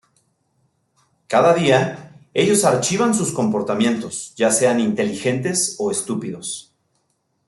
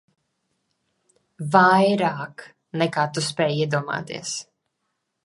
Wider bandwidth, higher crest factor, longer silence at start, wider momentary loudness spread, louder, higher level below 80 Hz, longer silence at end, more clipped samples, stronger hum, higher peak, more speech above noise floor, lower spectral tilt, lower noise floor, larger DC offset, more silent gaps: about the same, 12.5 kHz vs 11.5 kHz; about the same, 18 dB vs 22 dB; about the same, 1.3 s vs 1.4 s; second, 11 LU vs 17 LU; about the same, -19 LUFS vs -21 LUFS; first, -62 dBFS vs -70 dBFS; about the same, 0.85 s vs 0.85 s; neither; neither; about the same, -2 dBFS vs -2 dBFS; second, 50 dB vs 55 dB; about the same, -4 dB/octave vs -4.5 dB/octave; second, -69 dBFS vs -77 dBFS; neither; neither